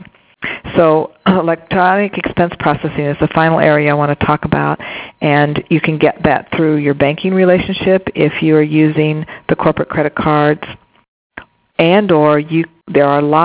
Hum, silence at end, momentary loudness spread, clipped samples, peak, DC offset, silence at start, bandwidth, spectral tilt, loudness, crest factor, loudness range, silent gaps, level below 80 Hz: none; 0 s; 7 LU; 0.2%; 0 dBFS; under 0.1%; 0 s; 4 kHz; -10.5 dB/octave; -13 LUFS; 14 dB; 2 LU; 11.08-11.30 s; -42 dBFS